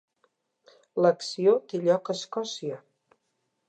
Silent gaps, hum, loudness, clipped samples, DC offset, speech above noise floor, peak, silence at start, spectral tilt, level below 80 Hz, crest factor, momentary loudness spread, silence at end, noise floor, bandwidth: none; none; -27 LUFS; under 0.1%; under 0.1%; 52 dB; -10 dBFS; 0.95 s; -5 dB/octave; -84 dBFS; 18 dB; 12 LU; 0.9 s; -77 dBFS; 9 kHz